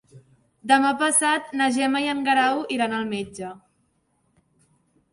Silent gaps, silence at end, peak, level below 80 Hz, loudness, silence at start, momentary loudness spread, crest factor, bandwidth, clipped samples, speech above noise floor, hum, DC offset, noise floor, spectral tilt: none; 1.55 s; -4 dBFS; -66 dBFS; -21 LUFS; 0.15 s; 15 LU; 20 dB; 12 kHz; under 0.1%; 46 dB; none; under 0.1%; -68 dBFS; -2 dB/octave